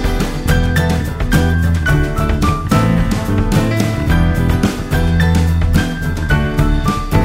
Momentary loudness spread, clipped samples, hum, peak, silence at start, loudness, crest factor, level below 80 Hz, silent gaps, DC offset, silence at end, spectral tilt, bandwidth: 4 LU; under 0.1%; none; 0 dBFS; 0 s; -15 LUFS; 14 dB; -18 dBFS; none; under 0.1%; 0 s; -6.5 dB/octave; 16.5 kHz